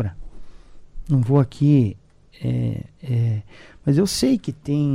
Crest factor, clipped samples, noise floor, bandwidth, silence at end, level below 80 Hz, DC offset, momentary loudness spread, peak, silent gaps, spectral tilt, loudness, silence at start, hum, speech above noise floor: 16 dB; under 0.1%; -39 dBFS; 13 kHz; 0 s; -42 dBFS; under 0.1%; 11 LU; -4 dBFS; none; -7 dB/octave; -21 LUFS; 0 s; none; 19 dB